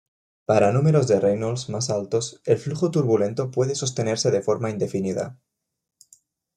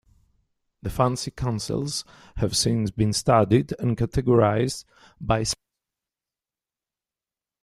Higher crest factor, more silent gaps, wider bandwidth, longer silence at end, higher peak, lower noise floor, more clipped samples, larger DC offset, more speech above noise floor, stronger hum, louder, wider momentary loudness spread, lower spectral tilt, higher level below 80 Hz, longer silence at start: about the same, 18 dB vs 20 dB; neither; second, 11 kHz vs 14 kHz; second, 1.25 s vs 2.1 s; about the same, -6 dBFS vs -6 dBFS; second, -58 dBFS vs under -90 dBFS; neither; neither; second, 37 dB vs over 67 dB; neither; about the same, -23 LUFS vs -24 LUFS; second, 8 LU vs 13 LU; about the same, -6 dB/octave vs -5.5 dB/octave; second, -62 dBFS vs -44 dBFS; second, 0.5 s vs 0.85 s